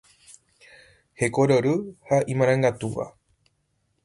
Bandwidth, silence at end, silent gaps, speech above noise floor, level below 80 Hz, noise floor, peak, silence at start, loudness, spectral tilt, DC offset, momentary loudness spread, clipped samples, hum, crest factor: 11.5 kHz; 0.95 s; none; 49 dB; -58 dBFS; -71 dBFS; -8 dBFS; 1.2 s; -23 LUFS; -6.5 dB/octave; under 0.1%; 11 LU; under 0.1%; none; 18 dB